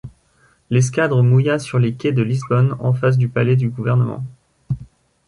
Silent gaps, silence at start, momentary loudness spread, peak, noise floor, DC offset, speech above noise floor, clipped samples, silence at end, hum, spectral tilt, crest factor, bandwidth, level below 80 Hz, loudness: none; 0.05 s; 13 LU; -4 dBFS; -57 dBFS; under 0.1%; 41 dB; under 0.1%; 0.45 s; none; -7.5 dB/octave; 14 dB; 11 kHz; -50 dBFS; -18 LUFS